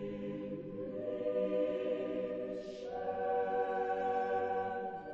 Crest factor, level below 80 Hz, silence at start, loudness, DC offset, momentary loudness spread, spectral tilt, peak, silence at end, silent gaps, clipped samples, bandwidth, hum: 12 dB; -70 dBFS; 0 s; -37 LUFS; under 0.1%; 8 LU; -7.5 dB/octave; -24 dBFS; 0 s; none; under 0.1%; 7.2 kHz; none